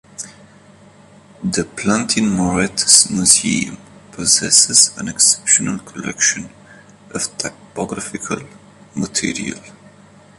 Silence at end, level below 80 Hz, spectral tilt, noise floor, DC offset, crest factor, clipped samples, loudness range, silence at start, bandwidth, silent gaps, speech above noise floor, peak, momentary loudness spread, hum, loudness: 0.65 s; -48 dBFS; -2 dB/octave; -45 dBFS; under 0.1%; 18 dB; under 0.1%; 12 LU; 0.2 s; 16 kHz; none; 28 dB; 0 dBFS; 18 LU; none; -14 LUFS